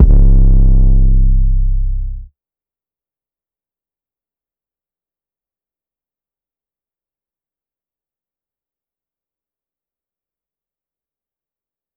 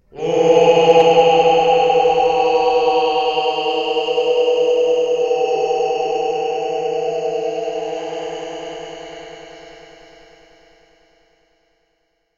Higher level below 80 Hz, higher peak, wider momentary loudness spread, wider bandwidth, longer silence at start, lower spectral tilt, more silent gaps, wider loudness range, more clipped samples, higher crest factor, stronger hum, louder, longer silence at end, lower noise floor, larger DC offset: first, -16 dBFS vs -54 dBFS; about the same, 0 dBFS vs 0 dBFS; second, 14 LU vs 17 LU; second, 1 kHz vs 7.4 kHz; second, 0 s vs 0.15 s; first, -13.5 dB/octave vs -4 dB/octave; neither; about the same, 16 LU vs 17 LU; first, 0.1% vs under 0.1%; about the same, 14 dB vs 16 dB; neither; about the same, -14 LUFS vs -16 LUFS; first, 9.7 s vs 2.65 s; first, under -90 dBFS vs -67 dBFS; neither